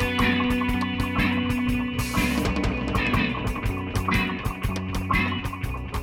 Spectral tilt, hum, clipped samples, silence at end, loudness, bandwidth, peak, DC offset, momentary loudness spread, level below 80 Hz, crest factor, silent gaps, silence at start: -5.5 dB/octave; none; under 0.1%; 0 s; -25 LUFS; 17.5 kHz; -8 dBFS; under 0.1%; 6 LU; -34 dBFS; 16 dB; none; 0 s